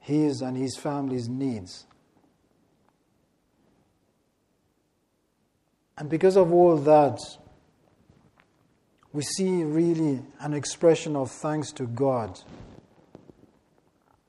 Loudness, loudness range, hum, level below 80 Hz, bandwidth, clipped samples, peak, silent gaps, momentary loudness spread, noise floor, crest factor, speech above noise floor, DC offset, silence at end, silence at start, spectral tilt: -24 LUFS; 11 LU; none; -66 dBFS; 12 kHz; under 0.1%; -8 dBFS; none; 18 LU; -72 dBFS; 20 dB; 48 dB; under 0.1%; 1.6 s; 0.05 s; -6 dB/octave